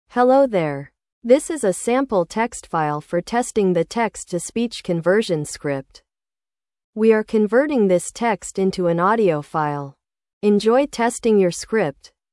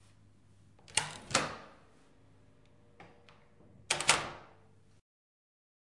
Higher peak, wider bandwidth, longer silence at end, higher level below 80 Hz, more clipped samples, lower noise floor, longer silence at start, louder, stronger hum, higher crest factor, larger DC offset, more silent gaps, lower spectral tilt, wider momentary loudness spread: first, -2 dBFS vs -8 dBFS; about the same, 12 kHz vs 11.5 kHz; second, 0.4 s vs 1.55 s; first, -56 dBFS vs -68 dBFS; neither; first, under -90 dBFS vs -64 dBFS; second, 0.15 s vs 0.9 s; first, -20 LUFS vs -32 LUFS; neither; second, 18 dB vs 32 dB; neither; first, 1.12-1.22 s, 6.84-6.93 s, 10.33-10.41 s vs none; first, -5.5 dB/octave vs -1 dB/octave; second, 9 LU vs 22 LU